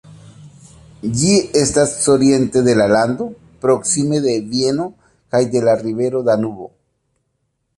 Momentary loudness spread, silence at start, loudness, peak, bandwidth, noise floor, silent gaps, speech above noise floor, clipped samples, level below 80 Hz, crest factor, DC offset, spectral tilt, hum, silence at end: 12 LU; 0.1 s; -16 LUFS; -2 dBFS; 11.5 kHz; -69 dBFS; none; 54 dB; under 0.1%; -48 dBFS; 14 dB; under 0.1%; -4.5 dB/octave; none; 1.1 s